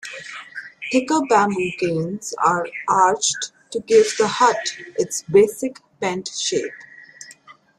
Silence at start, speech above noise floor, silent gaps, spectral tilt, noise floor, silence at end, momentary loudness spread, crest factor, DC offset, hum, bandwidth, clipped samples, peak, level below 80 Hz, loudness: 0.05 s; 27 dB; none; -3.5 dB/octave; -47 dBFS; 0.25 s; 17 LU; 18 dB; under 0.1%; none; 13.5 kHz; under 0.1%; -2 dBFS; -64 dBFS; -20 LUFS